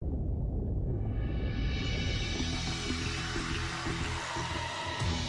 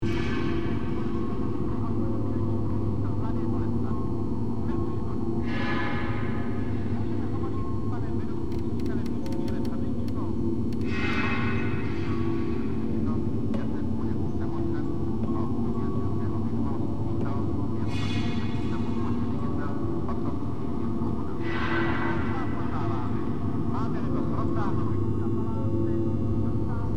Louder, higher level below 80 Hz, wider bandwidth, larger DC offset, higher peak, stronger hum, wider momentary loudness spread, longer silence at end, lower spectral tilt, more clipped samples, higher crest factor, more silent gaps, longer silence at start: second, -34 LUFS vs -29 LUFS; about the same, -38 dBFS vs -42 dBFS; first, 11.5 kHz vs 8.4 kHz; second, under 0.1% vs 4%; second, -20 dBFS vs -14 dBFS; neither; about the same, 2 LU vs 3 LU; about the same, 0 s vs 0 s; second, -4.5 dB/octave vs -8.5 dB/octave; neither; about the same, 12 dB vs 14 dB; neither; about the same, 0 s vs 0 s